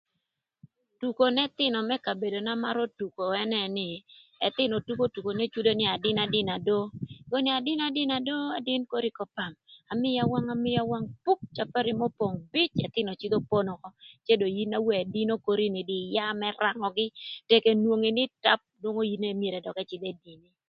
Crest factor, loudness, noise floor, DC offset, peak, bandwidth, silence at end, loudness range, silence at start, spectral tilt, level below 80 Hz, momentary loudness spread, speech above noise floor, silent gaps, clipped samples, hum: 24 dB; -28 LUFS; -83 dBFS; under 0.1%; -6 dBFS; 5.6 kHz; 0.35 s; 3 LU; 1 s; -8 dB/octave; -66 dBFS; 10 LU; 54 dB; none; under 0.1%; none